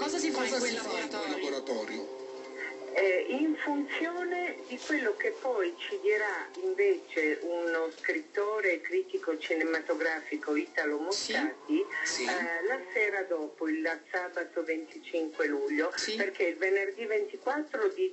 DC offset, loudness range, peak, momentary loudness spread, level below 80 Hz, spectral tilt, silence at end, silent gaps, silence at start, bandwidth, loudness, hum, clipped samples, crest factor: under 0.1%; 2 LU; -16 dBFS; 6 LU; -80 dBFS; -1.5 dB/octave; 0 s; none; 0 s; 8.6 kHz; -32 LUFS; none; under 0.1%; 16 dB